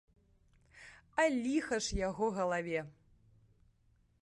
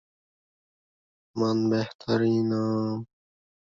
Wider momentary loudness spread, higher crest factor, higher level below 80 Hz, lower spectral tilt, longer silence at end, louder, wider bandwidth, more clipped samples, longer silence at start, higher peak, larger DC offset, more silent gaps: first, 19 LU vs 12 LU; about the same, 20 dB vs 16 dB; first, -54 dBFS vs -66 dBFS; second, -4.5 dB/octave vs -7.5 dB/octave; first, 1.3 s vs 0.65 s; second, -35 LUFS vs -26 LUFS; first, 11.5 kHz vs 7.4 kHz; neither; second, 0.75 s vs 1.35 s; second, -18 dBFS vs -12 dBFS; neither; second, none vs 1.95-1.99 s